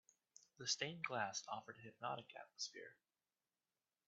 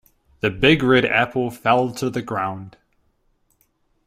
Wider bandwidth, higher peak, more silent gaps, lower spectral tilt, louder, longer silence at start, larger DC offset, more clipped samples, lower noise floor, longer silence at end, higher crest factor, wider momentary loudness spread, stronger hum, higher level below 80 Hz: second, 8 kHz vs 15.5 kHz; second, -26 dBFS vs -2 dBFS; neither; second, -1 dB/octave vs -5.5 dB/octave; second, -46 LUFS vs -19 LUFS; first, 0.6 s vs 0.45 s; neither; neither; first, under -90 dBFS vs -65 dBFS; second, 1.15 s vs 1.35 s; about the same, 24 dB vs 20 dB; first, 16 LU vs 10 LU; neither; second, under -90 dBFS vs -48 dBFS